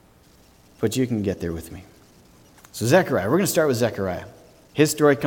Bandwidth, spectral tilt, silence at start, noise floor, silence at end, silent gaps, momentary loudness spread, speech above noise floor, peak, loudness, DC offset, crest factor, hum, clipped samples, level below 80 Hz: 18.5 kHz; -5 dB/octave; 0.8 s; -54 dBFS; 0 s; none; 16 LU; 33 dB; -4 dBFS; -22 LUFS; under 0.1%; 20 dB; none; under 0.1%; -52 dBFS